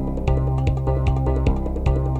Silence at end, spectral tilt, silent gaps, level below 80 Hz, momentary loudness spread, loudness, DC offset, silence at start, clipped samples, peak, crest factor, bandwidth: 0 s; -9 dB/octave; none; -22 dBFS; 2 LU; -22 LUFS; under 0.1%; 0 s; under 0.1%; -6 dBFS; 14 dB; 7.4 kHz